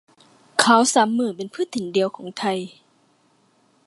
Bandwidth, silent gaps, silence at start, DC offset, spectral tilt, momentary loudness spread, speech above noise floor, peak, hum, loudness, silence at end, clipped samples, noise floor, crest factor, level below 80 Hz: 11.5 kHz; none; 0.55 s; under 0.1%; -3 dB/octave; 13 LU; 41 dB; 0 dBFS; none; -21 LUFS; 1.2 s; under 0.1%; -61 dBFS; 22 dB; -74 dBFS